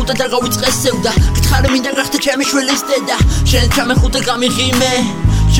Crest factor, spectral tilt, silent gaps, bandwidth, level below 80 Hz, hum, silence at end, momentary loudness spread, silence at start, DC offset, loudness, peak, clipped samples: 12 dB; -4 dB/octave; none; 17 kHz; -18 dBFS; none; 0 s; 3 LU; 0 s; 1%; -13 LUFS; 0 dBFS; under 0.1%